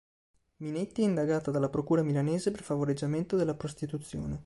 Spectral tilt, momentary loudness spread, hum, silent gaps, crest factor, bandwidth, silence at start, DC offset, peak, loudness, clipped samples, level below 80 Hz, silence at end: -7.5 dB/octave; 9 LU; none; none; 14 dB; 11.5 kHz; 0.6 s; under 0.1%; -16 dBFS; -31 LUFS; under 0.1%; -56 dBFS; 0 s